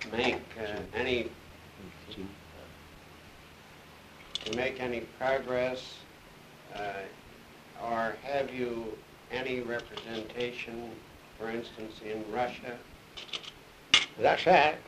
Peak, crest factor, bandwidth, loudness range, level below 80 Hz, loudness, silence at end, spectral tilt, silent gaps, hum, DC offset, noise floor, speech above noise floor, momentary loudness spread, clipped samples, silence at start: -8 dBFS; 26 dB; 15 kHz; 7 LU; -62 dBFS; -32 LUFS; 0 s; -3.5 dB/octave; none; none; under 0.1%; -53 dBFS; 21 dB; 25 LU; under 0.1%; 0 s